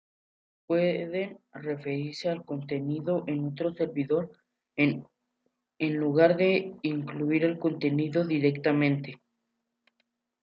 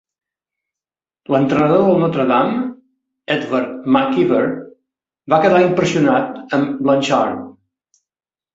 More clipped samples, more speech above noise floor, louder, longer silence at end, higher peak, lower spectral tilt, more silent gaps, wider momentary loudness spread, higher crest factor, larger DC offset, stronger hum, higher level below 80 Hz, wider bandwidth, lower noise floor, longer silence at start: neither; second, 54 dB vs 75 dB; second, -28 LUFS vs -16 LUFS; first, 1.25 s vs 1.05 s; second, -10 dBFS vs -2 dBFS; first, -8 dB/octave vs -6.5 dB/octave; neither; about the same, 10 LU vs 9 LU; about the same, 20 dB vs 16 dB; neither; neither; second, -74 dBFS vs -58 dBFS; about the same, 7.4 kHz vs 8 kHz; second, -81 dBFS vs -90 dBFS; second, 0.7 s vs 1.3 s